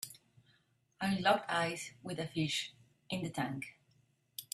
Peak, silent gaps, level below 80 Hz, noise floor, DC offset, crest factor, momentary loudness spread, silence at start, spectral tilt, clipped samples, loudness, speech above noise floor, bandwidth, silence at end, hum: -16 dBFS; none; -74 dBFS; -73 dBFS; under 0.1%; 22 dB; 16 LU; 0 s; -4 dB/octave; under 0.1%; -36 LUFS; 37 dB; 15.5 kHz; 0.1 s; none